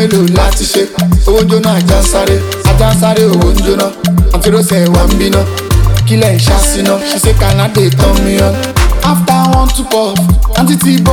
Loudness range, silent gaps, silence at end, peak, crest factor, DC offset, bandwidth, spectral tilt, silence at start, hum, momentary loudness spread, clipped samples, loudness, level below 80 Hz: 0 LU; none; 0 s; 0 dBFS; 8 dB; under 0.1%; 19 kHz; -5.5 dB/octave; 0 s; none; 3 LU; under 0.1%; -9 LUFS; -14 dBFS